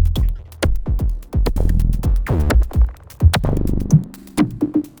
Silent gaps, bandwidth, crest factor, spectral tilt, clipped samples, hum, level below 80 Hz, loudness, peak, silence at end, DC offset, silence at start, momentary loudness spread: none; over 20 kHz; 16 dB; -7 dB/octave; under 0.1%; none; -18 dBFS; -19 LUFS; -2 dBFS; 0.1 s; under 0.1%; 0 s; 6 LU